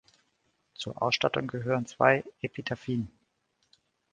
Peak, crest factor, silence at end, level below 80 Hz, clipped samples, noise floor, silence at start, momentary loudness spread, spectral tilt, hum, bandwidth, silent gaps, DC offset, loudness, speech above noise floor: -6 dBFS; 26 dB; 1.05 s; -64 dBFS; under 0.1%; -75 dBFS; 0.8 s; 15 LU; -5 dB/octave; none; 9.6 kHz; none; under 0.1%; -29 LUFS; 46 dB